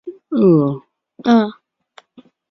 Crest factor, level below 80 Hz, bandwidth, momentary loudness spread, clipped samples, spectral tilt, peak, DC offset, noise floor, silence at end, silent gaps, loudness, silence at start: 16 dB; -62 dBFS; 6.2 kHz; 12 LU; under 0.1%; -9 dB/octave; -2 dBFS; under 0.1%; -50 dBFS; 1 s; none; -16 LUFS; 0.05 s